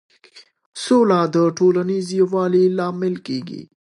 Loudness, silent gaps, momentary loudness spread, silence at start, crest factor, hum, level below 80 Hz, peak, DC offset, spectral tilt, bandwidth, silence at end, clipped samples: -18 LUFS; 0.66-0.72 s; 12 LU; 0.35 s; 14 dB; none; -70 dBFS; -4 dBFS; under 0.1%; -6.5 dB/octave; 11 kHz; 0.25 s; under 0.1%